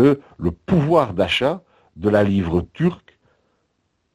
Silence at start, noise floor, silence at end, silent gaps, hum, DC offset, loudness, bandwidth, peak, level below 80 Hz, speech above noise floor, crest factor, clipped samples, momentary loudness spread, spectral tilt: 0 s; -70 dBFS; 1.2 s; none; none; under 0.1%; -20 LUFS; 12 kHz; -2 dBFS; -46 dBFS; 51 dB; 18 dB; under 0.1%; 9 LU; -7.5 dB/octave